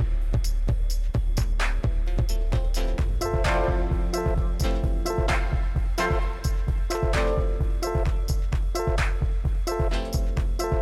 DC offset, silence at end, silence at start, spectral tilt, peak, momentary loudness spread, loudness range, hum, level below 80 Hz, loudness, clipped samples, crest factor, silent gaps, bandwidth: under 0.1%; 0 s; 0 s; -6 dB/octave; -14 dBFS; 3 LU; 1 LU; none; -24 dBFS; -26 LUFS; under 0.1%; 8 dB; none; 12.5 kHz